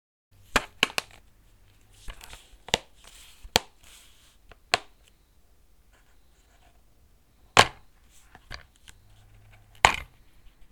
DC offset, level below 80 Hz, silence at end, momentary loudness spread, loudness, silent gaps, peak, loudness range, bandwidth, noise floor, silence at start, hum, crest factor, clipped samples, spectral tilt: under 0.1%; -50 dBFS; 0.7 s; 29 LU; -25 LUFS; none; 0 dBFS; 10 LU; 19.5 kHz; -61 dBFS; 0.55 s; none; 32 dB; under 0.1%; -1.5 dB/octave